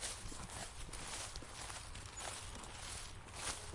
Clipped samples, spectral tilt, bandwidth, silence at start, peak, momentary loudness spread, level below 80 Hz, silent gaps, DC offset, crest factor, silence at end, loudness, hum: under 0.1%; -2 dB/octave; 11.5 kHz; 0 s; -24 dBFS; 4 LU; -56 dBFS; none; under 0.1%; 22 dB; 0 s; -47 LUFS; none